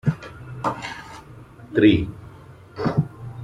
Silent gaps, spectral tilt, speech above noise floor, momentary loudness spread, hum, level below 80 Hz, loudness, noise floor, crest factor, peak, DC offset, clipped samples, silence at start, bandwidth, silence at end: none; -7.5 dB/octave; 24 dB; 25 LU; none; -46 dBFS; -23 LUFS; -44 dBFS; 20 dB; -4 dBFS; under 0.1%; under 0.1%; 0.05 s; 10.5 kHz; 0 s